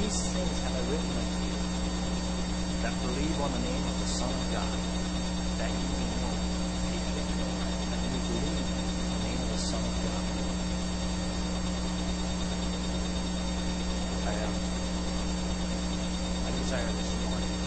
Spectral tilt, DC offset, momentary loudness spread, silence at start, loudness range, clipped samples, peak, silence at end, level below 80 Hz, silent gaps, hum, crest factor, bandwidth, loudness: -4.5 dB/octave; under 0.1%; 2 LU; 0 s; 1 LU; under 0.1%; -16 dBFS; 0 s; -36 dBFS; none; none; 14 dB; 8.8 kHz; -32 LUFS